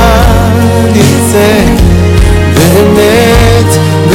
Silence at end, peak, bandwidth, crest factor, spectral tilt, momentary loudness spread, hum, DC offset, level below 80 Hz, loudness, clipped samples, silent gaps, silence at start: 0 s; 0 dBFS; 17 kHz; 4 dB; -5.5 dB/octave; 2 LU; none; under 0.1%; -14 dBFS; -6 LUFS; 10%; none; 0 s